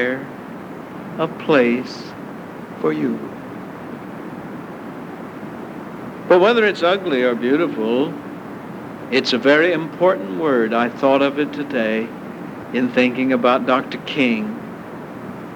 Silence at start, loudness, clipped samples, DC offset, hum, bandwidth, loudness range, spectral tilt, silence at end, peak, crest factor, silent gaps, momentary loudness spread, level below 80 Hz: 0 s; -18 LUFS; under 0.1%; under 0.1%; none; 19 kHz; 10 LU; -6 dB/octave; 0 s; -2 dBFS; 18 dB; none; 17 LU; -62 dBFS